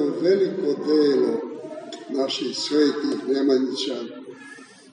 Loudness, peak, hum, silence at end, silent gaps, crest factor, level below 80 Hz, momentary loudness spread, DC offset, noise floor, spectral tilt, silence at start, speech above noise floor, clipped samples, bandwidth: -22 LUFS; -8 dBFS; none; 0.3 s; none; 14 dB; -80 dBFS; 16 LU; under 0.1%; -44 dBFS; -4.5 dB/octave; 0 s; 23 dB; under 0.1%; 10 kHz